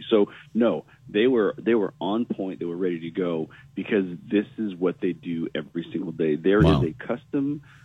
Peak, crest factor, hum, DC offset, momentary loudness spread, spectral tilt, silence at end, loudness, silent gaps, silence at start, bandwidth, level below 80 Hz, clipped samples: -6 dBFS; 18 dB; none; under 0.1%; 11 LU; -8.5 dB/octave; 0.25 s; -25 LUFS; none; 0 s; 8.8 kHz; -46 dBFS; under 0.1%